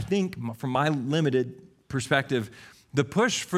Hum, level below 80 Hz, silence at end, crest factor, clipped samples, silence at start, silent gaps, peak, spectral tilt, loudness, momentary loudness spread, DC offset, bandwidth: none; -60 dBFS; 0 s; 20 dB; under 0.1%; 0 s; none; -8 dBFS; -5 dB/octave; -27 LUFS; 9 LU; under 0.1%; 15 kHz